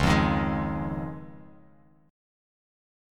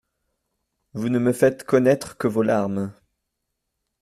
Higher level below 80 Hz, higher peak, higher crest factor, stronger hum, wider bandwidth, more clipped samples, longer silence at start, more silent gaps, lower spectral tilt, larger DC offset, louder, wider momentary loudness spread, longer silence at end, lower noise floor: first, -40 dBFS vs -62 dBFS; second, -10 dBFS vs -4 dBFS; about the same, 20 dB vs 20 dB; neither; about the same, 15 kHz vs 14.5 kHz; neither; second, 0 s vs 0.95 s; neither; about the same, -6.5 dB/octave vs -7 dB/octave; neither; second, -28 LUFS vs -21 LUFS; first, 19 LU vs 11 LU; about the same, 1 s vs 1.1 s; second, -58 dBFS vs -79 dBFS